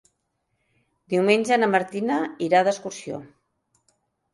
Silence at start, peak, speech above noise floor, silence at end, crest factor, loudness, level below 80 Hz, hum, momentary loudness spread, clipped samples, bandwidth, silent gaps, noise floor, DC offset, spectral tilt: 1.1 s; -6 dBFS; 53 dB; 1.1 s; 20 dB; -22 LUFS; -72 dBFS; none; 15 LU; under 0.1%; 11.5 kHz; none; -75 dBFS; under 0.1%; -5 dB/octave